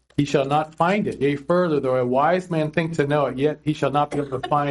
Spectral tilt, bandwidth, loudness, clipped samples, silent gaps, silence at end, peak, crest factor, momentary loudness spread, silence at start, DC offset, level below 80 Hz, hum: -7 dB/octave; 11.5 kHz; -22 LUFS; under 0.1%; none; 0 s; -4 dBFS; 16 dB; 4 LU; 0.2 s; under 0.1%; -54 dBFS; none